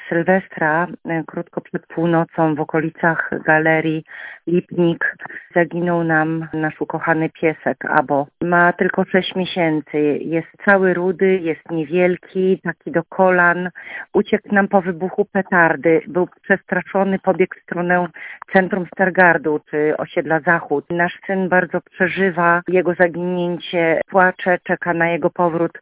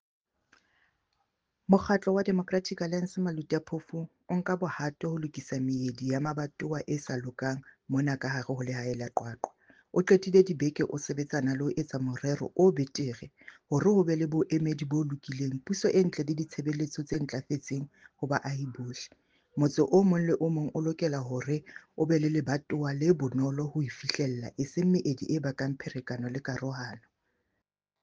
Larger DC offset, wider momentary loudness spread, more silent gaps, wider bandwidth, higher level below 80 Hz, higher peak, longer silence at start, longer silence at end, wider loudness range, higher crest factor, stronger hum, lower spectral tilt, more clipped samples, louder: neither; second, 8 LU vs 12 LU; neither; second, 4 kHz vs 7.8 kHz; first, -58 dBFS vs -64 dBFS; first, 0 dBFS vs -8 dBFS; second, 0 s vs 1.7 s; second, 0 s vs 1.05 s; second, 2 LU vs 5 LU; about the same, 18 dB vs 22 dB; neither; first, -10.5 dB/octave vs -6.5 dB/octave; neither; first, -18 LUFS vs -30 LUFS